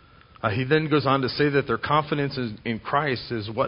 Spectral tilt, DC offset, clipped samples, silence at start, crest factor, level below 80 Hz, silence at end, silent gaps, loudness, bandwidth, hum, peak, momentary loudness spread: -10.5 dB/octave; under 0.1%; under 0.1%; 0.45 s; 18 dB; -52 dBFS; 0 s; none; -24 LUFS; 5.4 kHz; none; -6 dBFS; 8 LU